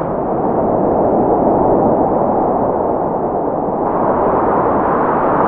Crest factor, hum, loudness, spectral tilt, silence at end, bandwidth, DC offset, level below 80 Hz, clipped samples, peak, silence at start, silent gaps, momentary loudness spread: 14 dB; none; -15 LUFS; -13 dB/octave; 0 s; 3.7 kHz; under 0.1%; -38 dBFS; under 0.1%; 0 dBFS; 0 s; none; 5 LU